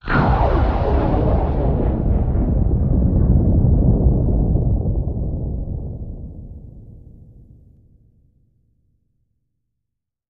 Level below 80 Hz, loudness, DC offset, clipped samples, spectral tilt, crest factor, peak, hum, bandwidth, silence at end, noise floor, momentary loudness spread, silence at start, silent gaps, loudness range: -22 dBFS; -19 LUFS; under 0.1%; under 0.1%; -11 dB/octave; 16 dB; -2 dBFS; none; 4.8 kHz; 3.3 s; -81 dBFS; 16 LU; 0.05 s; none; 16 LU